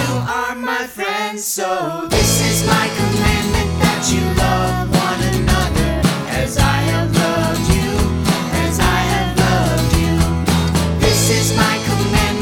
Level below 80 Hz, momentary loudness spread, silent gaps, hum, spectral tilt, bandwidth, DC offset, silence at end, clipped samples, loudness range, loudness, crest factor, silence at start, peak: -24 dBFS; 6 LU; none; none; -4.5 dB/octave; 19 kHz; under 0.1%; 0 s; under 0.1%; 1 LU; -16 LUFS; 16 dB; 0 s; 0 dBFS